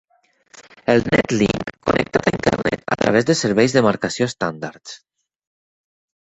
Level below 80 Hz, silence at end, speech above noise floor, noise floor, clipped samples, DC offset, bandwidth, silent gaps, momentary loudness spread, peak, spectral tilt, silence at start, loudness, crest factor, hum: -46 dBFS; 1.25 s; 36 dB; -54 dBFS; under 0.1%; under 0.1%; 8.4 kHz; none; 14 LU; 0 dBFS; -5 dB/octave; 0.55 s; -19 LUFS; 20 dB; none